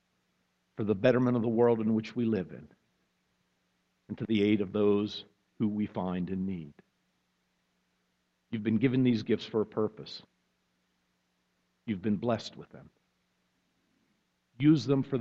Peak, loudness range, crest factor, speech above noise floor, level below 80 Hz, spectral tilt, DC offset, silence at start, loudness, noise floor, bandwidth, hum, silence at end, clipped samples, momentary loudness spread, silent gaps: -10 dBFS; 8 LU; 22 dB; 48 dB; -68 dBFS; -8 dB/octave; under 0.1%; 0.8 s; -30 LUFS; -77 dBFS; 7.6 kHz; 60 Hz at -65 dBFS; 0 s; under 0.1%; 18 LU; none